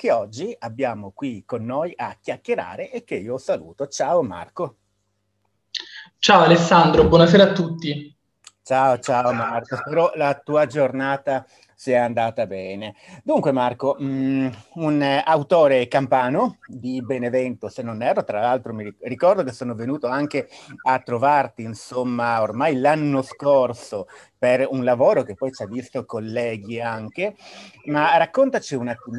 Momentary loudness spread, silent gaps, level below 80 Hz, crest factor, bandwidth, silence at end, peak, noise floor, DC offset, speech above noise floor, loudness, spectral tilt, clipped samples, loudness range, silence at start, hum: 15 LU; none; -48 dBFS; 20 dB; 11.5 kHz; 0 s; 0 dBFS; -71 dBFS; under 0.1%; 51 dB; -21 LUFS; -6 dB/octave; under 0.1%; 10 LU; 0 s; none